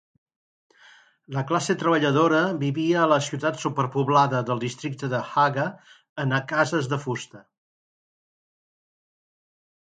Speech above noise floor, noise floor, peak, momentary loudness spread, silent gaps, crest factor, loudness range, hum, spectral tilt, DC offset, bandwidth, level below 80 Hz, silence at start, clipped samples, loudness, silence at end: 31 dB; -54 dBFS; -6 dBFS; 11 LU; 6.09-6.16 s; 20 dB; 7 LU; none; -5.5 dB/octave; under 0.1%; 9.4 kHz; -70 dBFS; 1.3 s; under 0.1%; -24 LUFS; 2.6 s